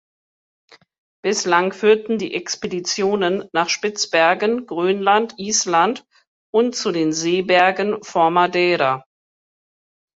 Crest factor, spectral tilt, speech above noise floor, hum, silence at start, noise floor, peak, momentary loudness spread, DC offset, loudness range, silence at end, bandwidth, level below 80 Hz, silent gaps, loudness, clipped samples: 18 dB; -3 dB/octave; over 72 dB; none; 1.25 s; under -90 dBFS; -2 dBFS; 7 LU; under 0.1%; 2 LU; 1.2 s; 8 kHz; -66 dBFS; 6.27-6.53 s; -18 LUFS; under 0.1%